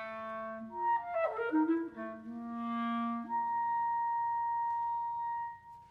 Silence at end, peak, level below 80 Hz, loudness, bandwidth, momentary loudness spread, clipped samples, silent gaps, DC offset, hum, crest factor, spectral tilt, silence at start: 0 s; -22 dBFS; -74 dBFS; -35 LUFS; 4.9 kHz; 10 LU; under 0.1%; none; under 0.1%; none; 14 dB; -7.5 dB/octave; 0 s